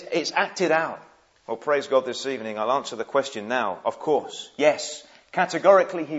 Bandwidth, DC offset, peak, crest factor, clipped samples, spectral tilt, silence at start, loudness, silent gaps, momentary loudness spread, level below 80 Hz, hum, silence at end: 8 kHz; under 0.1%; -4 dBFS; 20 dB; under 0.1%; -3.5 dB/octave; 0 s; -24 LUFS; none; 13 LU; -78 dBFS; none; 0 s